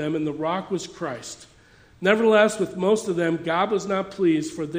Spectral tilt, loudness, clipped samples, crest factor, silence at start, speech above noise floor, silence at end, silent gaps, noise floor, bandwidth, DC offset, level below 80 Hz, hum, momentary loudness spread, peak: -5 dB/octave; -23 LUFS; under 0.1%; 20 dB; 0 s; 30 dB; 0 s; none; -53 dBFS; 15.5 kHz; under 0.1%; -62 dBFS; none; 14 LU; -2 dBFS